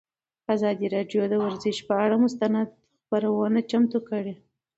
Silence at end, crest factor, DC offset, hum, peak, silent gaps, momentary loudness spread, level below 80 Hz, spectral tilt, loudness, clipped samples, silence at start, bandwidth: 0.4 s; 16 dB; under 0.1%; none; -10 dBFS; none; 9 LU; -70 dBFS; -6.5 dB/octave; -25 LUFS; under 0.1%; 0.5 s; 8 kHz